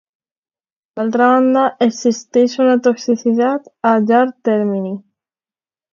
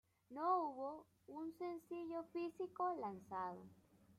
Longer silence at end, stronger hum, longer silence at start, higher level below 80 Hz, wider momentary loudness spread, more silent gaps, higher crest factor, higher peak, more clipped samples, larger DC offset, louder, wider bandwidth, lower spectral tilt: first, 0.95 s vs 0.05 s; neither; first, 0.95 s vs 0.3 s; first, -68 dBFS vs -86 dBFS; second, 9 LU vs 17 LU; neither; about the same, 16 dB vs 18 dB; first, 0 dBFS vs -28 dBFS; neither; neither; first, -15 LUFS vs -45 LUFS; second, 7.4 kHz vs 14 kHz; second, -5.5 dB/octave vs -7 dB/octave